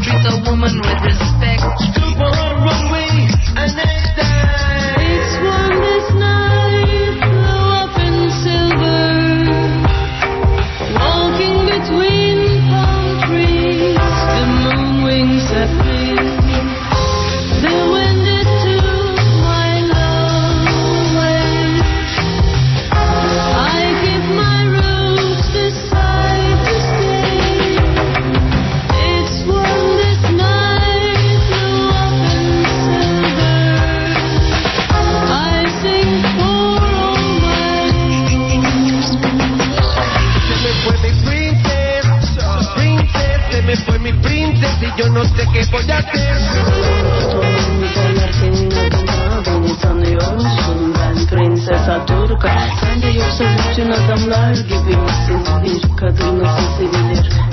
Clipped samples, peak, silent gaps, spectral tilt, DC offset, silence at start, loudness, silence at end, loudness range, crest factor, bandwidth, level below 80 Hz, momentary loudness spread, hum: under 0.1%; 0 dBFS; none; -6 dB/octave; under 0.1%; 0 s; -14 LUFS; 0 s; 1 LU; 12 dB; 6.2 kHz; -20 dBFS; 3 LU; none